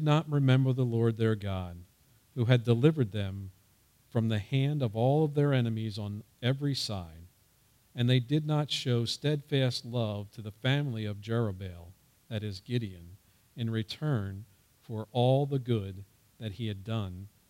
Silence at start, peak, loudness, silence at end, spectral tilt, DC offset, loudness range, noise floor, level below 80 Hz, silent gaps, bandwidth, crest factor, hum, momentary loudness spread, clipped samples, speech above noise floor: 0 s; -12 dBFS; -31 LUFS; 0.25 s; -7 dB/octave; under 0.1%; 6 LU; -66 dBFS; -64 dBFS; none; 14 kHz; 20 dB; none; 16 LU; under 0.1%; 36 dB